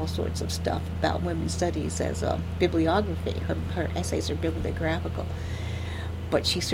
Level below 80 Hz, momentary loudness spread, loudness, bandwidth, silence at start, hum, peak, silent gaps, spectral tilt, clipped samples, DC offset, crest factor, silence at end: -38 dBFS; 8 LU; -28 LUFS; 15.5 kHz; 0 s; none; -10 dBFS; none; -5.5 dB/octave; under 0.1%; under 0.1%; 18 dB; 0 s